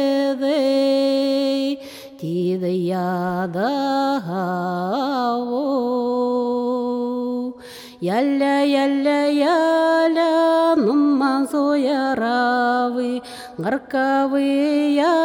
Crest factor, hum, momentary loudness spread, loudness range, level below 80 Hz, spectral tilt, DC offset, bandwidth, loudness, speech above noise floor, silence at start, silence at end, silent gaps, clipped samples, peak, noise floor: 12 dB; none; 8 LU; 5 LU; -64 dBFS; -6 dB/octave; under 0.1%; 16.5 kHz; -20 LUFS; 21 dB; 0 s; 0 s; none; under 0.1%; -8 dBFS; -39 dBFS